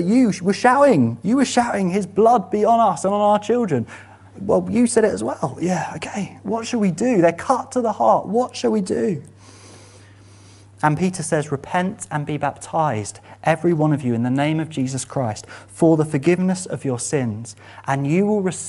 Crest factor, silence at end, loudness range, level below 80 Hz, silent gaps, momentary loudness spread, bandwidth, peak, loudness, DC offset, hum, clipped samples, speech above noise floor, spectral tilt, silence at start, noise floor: 18 dB; 0 s; 7 LU; -58 dBFS; none; 10 LU; 11.5 kHz; -2 dBFS; -20 LUFS; under 0.1%; none; under 0.1%; 27 dB; -6 dB/octave; 0 s; -46 dBFS